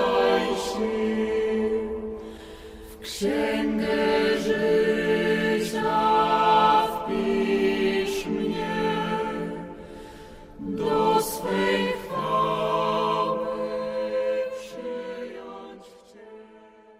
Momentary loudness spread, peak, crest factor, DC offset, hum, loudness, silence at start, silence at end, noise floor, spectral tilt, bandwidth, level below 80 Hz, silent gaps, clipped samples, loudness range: 18 LU; -8 dBFS; 18 dB; under 0.1%; none; -24 LUFS; 0 s; 0.35 s; -50 dBFS; -5 dB/octave; 16 kHz; -50 dBFS; none; under 0.1%; 6 LU